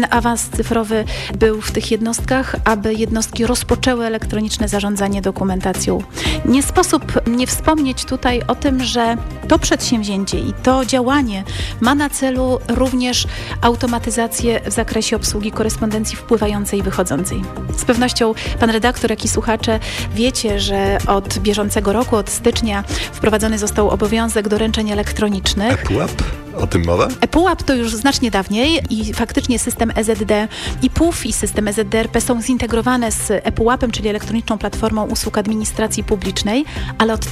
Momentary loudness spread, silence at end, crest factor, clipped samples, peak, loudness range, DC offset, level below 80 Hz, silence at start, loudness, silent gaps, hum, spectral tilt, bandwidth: 4 LU; 0 s; 14 dB; under 0.1%; -2 dBFS; 2 LU; under 0.1%; -28 dBFS; 0 s; -17 LUFS; none; none; -4.5 dB/octave; 16 kHz